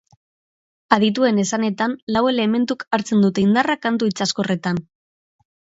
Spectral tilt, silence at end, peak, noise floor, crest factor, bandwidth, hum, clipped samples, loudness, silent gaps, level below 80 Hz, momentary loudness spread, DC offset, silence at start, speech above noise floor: -5 dB/octave; 0.95 s; 0 dBFS; under -90 dBFS; 20 dB; 8 kHz; none; under 0.1%; -19 LUFS; 2.02-2.07 s; -58 dBFS; 6 LU; under 0.1%; 0.9 s; over 71 dB